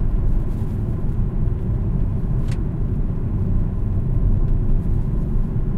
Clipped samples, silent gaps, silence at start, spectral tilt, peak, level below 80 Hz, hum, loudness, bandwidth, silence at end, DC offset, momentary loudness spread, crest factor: under 0.1%; none; 0 s; -10.5 dB/octave; -8 dBFS; -20 dBFS; none; -23 LUFS; 2.9 kHz; 0 s; under 0.1%; 3 LU; 12 dB